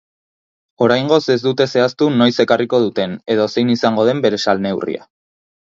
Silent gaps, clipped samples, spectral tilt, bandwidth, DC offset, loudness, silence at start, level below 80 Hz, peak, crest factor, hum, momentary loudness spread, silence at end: none; under 0.1%; -6 dB/octave; 7.6 kHz; under 0.1%; -16 LUFS; 0.8 s; -58 dBFS; 0 dBFS; 16 dB; none; 6 LU; 0.8 s